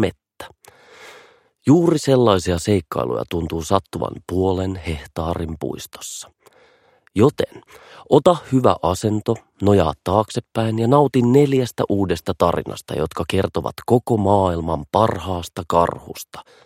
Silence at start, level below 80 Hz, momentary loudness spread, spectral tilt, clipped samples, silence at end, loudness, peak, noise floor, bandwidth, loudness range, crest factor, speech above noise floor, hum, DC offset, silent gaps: 0 s; -42 dBFS; 13 LU; -6.5 dB/octave; under 0.1%; 0.25 s; -19 LUFS; 0 dBFS; -56 dBFS; 16 kHz; 6 LU; 20 dB; 37 dB; none; under 0.1%; none